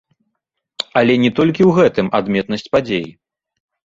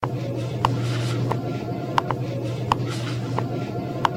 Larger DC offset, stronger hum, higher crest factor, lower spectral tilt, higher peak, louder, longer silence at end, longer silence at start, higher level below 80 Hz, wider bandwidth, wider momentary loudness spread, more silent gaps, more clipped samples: neither; neither; second, 16 dB vs 22 dB; about the same, -7 dB/octave vs -6.5 dB/octave; about the same, -2 dBFS vs -4 dBFS; first, -15 LUFS vs -26 LUFS; first, 0.75 s vs 0 s; first, 0.8 s vs 0 s; about the same, -52 dBFS vs -50 dBFS; second, 7.8 kHz vs 15 kHz; first, 10 LU vs 4 LU; neither; neither